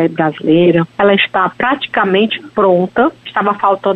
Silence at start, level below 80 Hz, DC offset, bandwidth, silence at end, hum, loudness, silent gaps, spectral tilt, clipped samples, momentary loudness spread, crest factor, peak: 0 s; -52 dBFS; under 0.1%; 4.9 kHz; 0 s; none; -13 LUFS; none; -8 dB/octave; under 0.1%; 5 LU; 12 dB; -2 dBFS